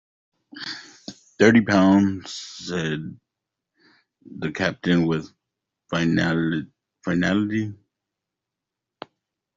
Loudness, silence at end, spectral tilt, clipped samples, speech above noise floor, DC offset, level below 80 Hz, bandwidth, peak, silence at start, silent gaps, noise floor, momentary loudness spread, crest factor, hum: -22 LUFS; 1.85 s; -6 dB/octave; under 0.1%; 64 dB; under 0.1%; -60 dBFS; 7.8 kHz; -2 dBFS; 0.55 s; none; -85 dBFS; 25 LU; 22 dB; none